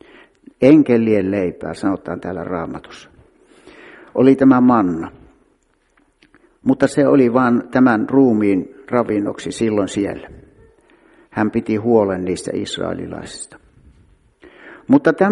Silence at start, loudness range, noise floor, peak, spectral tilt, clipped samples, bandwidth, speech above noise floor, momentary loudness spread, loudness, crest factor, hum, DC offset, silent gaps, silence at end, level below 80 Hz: 0.6 s; 6 LU; -60 dBFS; 0 dBFS; -7 dB/octave; under 0.1%; 11 kHz; 45 dB; 16 LU; -16 LUFS; 18 dB; none; under 0.1%; none; 0 s; -52 dBFS